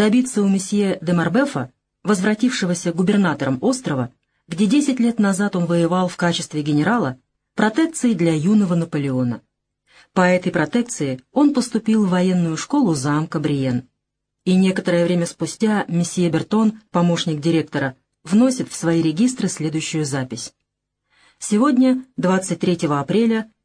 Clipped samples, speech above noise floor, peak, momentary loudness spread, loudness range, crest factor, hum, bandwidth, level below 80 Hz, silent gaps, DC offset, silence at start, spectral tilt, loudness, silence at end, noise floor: under 0.1%; 60 dB; -2 dBFS; 8 LU; 2 LU; 18 dB; none; 10.5 kHz; -60 dBFS; none; under 0.1%; 0 s; -6 dB/octave; -19 LUFS; 0.2 s; -78 dBFS